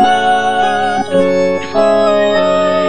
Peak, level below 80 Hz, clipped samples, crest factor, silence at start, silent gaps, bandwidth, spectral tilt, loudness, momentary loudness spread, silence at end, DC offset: 0 dBFS; -50 dBFS; under 0.1%; 12 dB; 0 s; none; 9.8 kHz; -4.5 dB/octave; -12 LUFS; 3 LU; 0 s; 3%